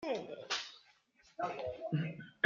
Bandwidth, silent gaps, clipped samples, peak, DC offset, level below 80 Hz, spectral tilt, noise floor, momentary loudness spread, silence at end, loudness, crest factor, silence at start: 7.6 kHz; none; under 0.1%; -14 dBFS; under 0.1%; -76 dBFS; -5 dB/octave; -69 dBFS; 12 LU; 0.15 s; -40 LUFS; 26 dB; 0 s